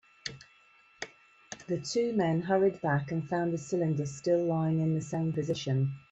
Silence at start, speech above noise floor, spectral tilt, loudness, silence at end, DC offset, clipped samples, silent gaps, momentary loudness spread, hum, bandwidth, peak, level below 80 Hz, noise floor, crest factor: 0.25 s; 32 dB; -6.5 dB/octave; -30 LUFS; 0.15 s; under 0.1%; under 0.1%; none; 16 LU; none; 8.2 kHz; -14 dBFS; -68 dBFS; -62 dBFS; 16 dB